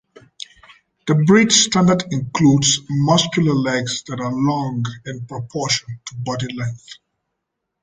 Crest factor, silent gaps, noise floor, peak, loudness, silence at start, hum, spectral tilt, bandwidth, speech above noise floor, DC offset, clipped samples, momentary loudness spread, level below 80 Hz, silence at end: 18 dB; none; -78 dBFS; 0 dBFS; -17 LUFS; 1.05 s; none; -4 dB/octave; 9.6 kHz; 60 dB; under 0.1%; under 0.1%; 18 LU; -52 dBFS; 0.9 s